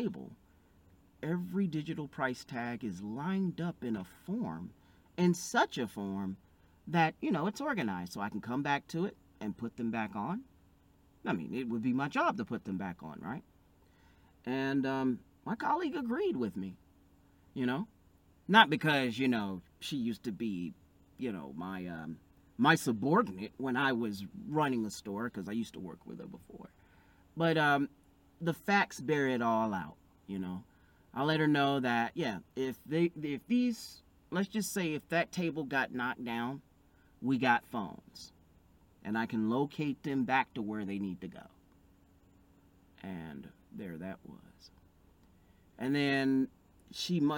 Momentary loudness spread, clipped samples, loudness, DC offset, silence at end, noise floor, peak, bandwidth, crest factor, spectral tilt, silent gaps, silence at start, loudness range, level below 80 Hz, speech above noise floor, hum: 17 LU; under 0.1%; -34 LUFS; under 0.1%; 0 s; -65 dBFS; -8 dBFS; 17 kHz; 26 dB; -5.5 dB/octave; none; 0 s; 7 LU; -70 dBFS; 31 dB; none